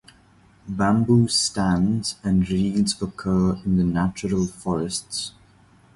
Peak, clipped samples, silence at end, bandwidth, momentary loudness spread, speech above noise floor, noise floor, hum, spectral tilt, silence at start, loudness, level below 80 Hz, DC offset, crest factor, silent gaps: -6 dBFS; under 0.1%; 0.65 s; 11.5 kHz; 9 LU; 33 dB; -54 dBFS; none; -5.5 dB/octave; 0.65 s; -22 LUFS; -44 dBFS; under 0.1%; 16 dB; none